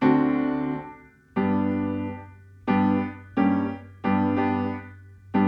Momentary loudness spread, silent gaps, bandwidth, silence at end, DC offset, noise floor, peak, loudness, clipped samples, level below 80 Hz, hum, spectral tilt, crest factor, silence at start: 12 LU; none; 5.4 kHz; 0 s; under 0.1%; -46 dBFS; -8 dBFS; -25 LUFS; under 0.1%; -58 dBFS; none; -10 dB/octave; 16 dB; 0 s